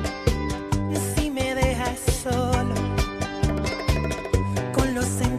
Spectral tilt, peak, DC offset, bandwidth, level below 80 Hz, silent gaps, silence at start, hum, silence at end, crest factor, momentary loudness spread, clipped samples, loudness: -5.5 dB/octave; -6 dBFS; under 0.1%; 14.5 kHz; -32 dBFS; none; 0 s; none; 0 s; 18 dB; 3 LU; under 0.1%; -25 LUFS